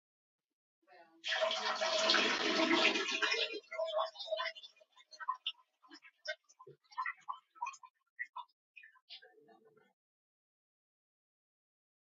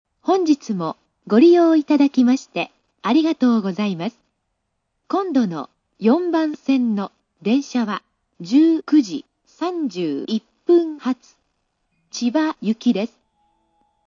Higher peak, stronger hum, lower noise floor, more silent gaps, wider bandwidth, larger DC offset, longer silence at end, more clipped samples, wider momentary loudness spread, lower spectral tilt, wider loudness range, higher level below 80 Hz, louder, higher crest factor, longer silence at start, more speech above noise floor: second, -16 dBFS vs -2 dBFS; neither; second, -66 dBFS vs -74 dBFS; first, 7.90-7.94 s, 8.10-8.16 s, 8.53-8.74 s, 9.02-9.08 s vs none; about the same, 7.6 kHz vs 7.4 kHz; neither; first, 3 s vs 1 s; neither; first, 20 LU vs 14 LU; second, 1.5 dB/octave vs -6 dB/octave; first, 18 LU vs 5 LU; second, under -90 dBFS vs -74 dBFS; second, -35 LUFS vs -19 LUFS; first, 24 dB vs 16 dB; first, 1 s vs 0.25 s; second, 31 dB vs 56 dB